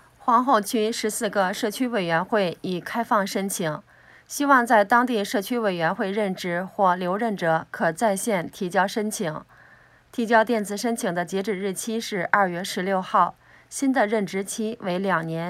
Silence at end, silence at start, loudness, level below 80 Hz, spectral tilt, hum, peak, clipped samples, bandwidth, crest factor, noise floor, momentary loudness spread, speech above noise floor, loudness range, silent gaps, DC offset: 0 s; 0.25 s; -23 LUFS; -66 dBFS; -4.5 dB/octave; none; 0 dBFS; under 0.1%; 16 kHz; 24 dB; -54 dBFS; 9 LU; 30 dB; 3 LU; none; under 0.1%